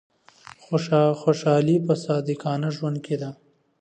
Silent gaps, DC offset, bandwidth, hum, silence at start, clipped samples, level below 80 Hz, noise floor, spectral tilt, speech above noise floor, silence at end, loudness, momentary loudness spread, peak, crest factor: none; under 0.1%; 9 kHz; none; 0.7 s; under 0.1%; -70 dBFS; -49 dBFS; -7.5 dB/octave; 27 dB; 0.45 s; -23 LUFS; 9 LU; -6 dBFS; 18 dB